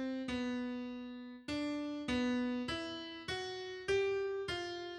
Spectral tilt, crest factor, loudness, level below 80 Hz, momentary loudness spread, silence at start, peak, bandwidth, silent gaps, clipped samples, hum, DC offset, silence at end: -4.5 dB/octave; 16 dB; -39 LUFS; -62 dBFS; 9 LU; 0 s; -24 dBFS; 11 kHz; none; under 0.1%; none; under 0.1%; 0 s